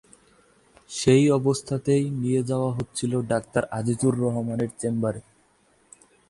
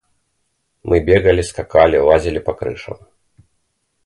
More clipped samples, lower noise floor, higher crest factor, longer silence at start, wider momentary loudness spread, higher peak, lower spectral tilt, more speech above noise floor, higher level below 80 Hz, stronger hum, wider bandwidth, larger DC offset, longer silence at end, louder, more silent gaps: neither; second, -62 dBFS vs -68 dBFS; about the same, 18 dB vs 16 dB; about the same, 0.9 s vs 0.85 s; second, 9 LU vs 20 LU; second, -6 dBFS vs 0 dBFS; about the same, -6 dB/octave vs -6 dB/octave; second, 39 dB vs 53 dB; second, -56 dBFS vs -34 dBFS; neither; about the same, 11.5 kHz vs 11.5 kHz; neither; about the same, 1.1 s vs 1.1 s; second, -24 LUFS vs -15 LUFS; neither